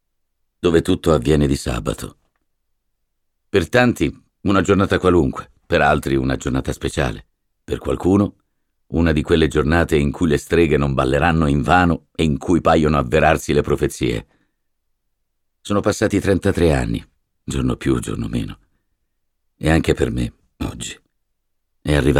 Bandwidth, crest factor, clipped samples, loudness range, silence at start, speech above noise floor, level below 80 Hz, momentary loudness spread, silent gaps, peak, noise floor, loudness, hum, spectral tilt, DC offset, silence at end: 16 kHz; 18 dB; under 0.1%; 6 LU; 0.65 s; 53 dB; -32 dBFS; 12 LU; none; 0 dBFS; -70 dBFS; -18 LUFS; none; -6 dB/octave; under 0.1%; 0 s